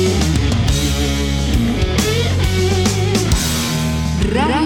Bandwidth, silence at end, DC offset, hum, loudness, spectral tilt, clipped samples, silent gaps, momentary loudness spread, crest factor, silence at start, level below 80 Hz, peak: 18 kHz; 0 s; under 0.1%; none; -16 LUFS; -5 dB/octave; under 0.1%; none; 2 LU; 12 dB; 0 s; -22 dBFS; -2 dBFS